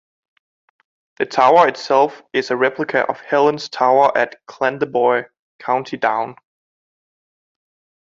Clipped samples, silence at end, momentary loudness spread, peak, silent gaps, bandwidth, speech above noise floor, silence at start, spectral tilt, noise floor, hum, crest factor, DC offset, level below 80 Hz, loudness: under 0.1%; 1.75 s; 10 LU; -2 dBFS; 5.39-5.59 s; 7.6 kHz; over 73 dB; 1.2 s; -5 dB/octave; under -90 dBFS; none; 18 dB; under 0.1%; -66 dBFS; -17 LUFS